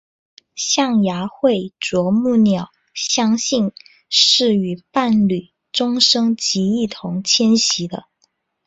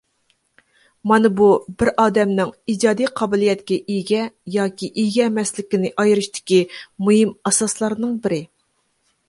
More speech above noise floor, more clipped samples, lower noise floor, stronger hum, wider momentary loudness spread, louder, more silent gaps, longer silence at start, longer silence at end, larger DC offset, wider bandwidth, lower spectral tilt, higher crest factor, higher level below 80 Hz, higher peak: about the same, 48 dB vs 49 dB; neither; about the same, -65 dBFS vs -67 dBFS; neither; first, 11 LU vs 7 LU; about the same, -17 LUFS vs -19 LUFS; neither; second, 0.55 s vs 1.05 s; second, 0.65 s vs 0.85 s; neither; second, 8 kHz vs 11.5 kHz; about the same, -3.5 dB/octave vs -4.5 dB/octave; about the same, 18 dB vs 18 dB; about the same, -58 dBFS vs -54 dBFS; about the same, 0 dBFS vs -2 dBFS